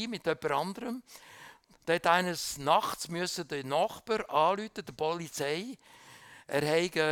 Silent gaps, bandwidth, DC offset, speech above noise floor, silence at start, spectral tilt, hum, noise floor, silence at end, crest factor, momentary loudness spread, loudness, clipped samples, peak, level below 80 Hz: none; 18 kHz; under 0.1%; 23 dB; 0 s; -3.5 dB/octave; none; -54 dBFS; 0 s; 22 dB; 20 LU; -31 LUFS; under 0.1%; -10 dBFS; -68 dBFS